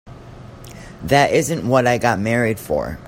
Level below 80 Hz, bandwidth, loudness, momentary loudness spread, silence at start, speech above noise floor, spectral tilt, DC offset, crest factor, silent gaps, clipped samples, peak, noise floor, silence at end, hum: -44 dBFS; 16.5 kHz; -17 LUFS; 23 LU; 0.05 s; 21 dB; -5 dB/octave; under 0.1%; 18 dB; none; under 0.1%; 0 dBFS; -38 dBFS; 0 s; none